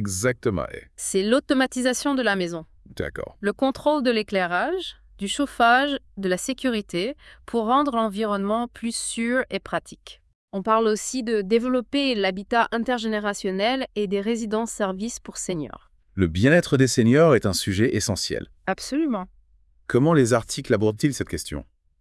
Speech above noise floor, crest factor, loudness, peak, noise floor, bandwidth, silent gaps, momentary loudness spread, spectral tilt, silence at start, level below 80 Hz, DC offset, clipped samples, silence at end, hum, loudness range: 36 dB; 18 dB; -23 LUFS; -4 dBFS; -58 dBFS; 12 kHz; 10.35-10.48 s; 13 LU; -4.5 dB/octave; 0 s; -50 dBFS; under 0.1%; under 0.1%; 0.35 s; none; 5 LU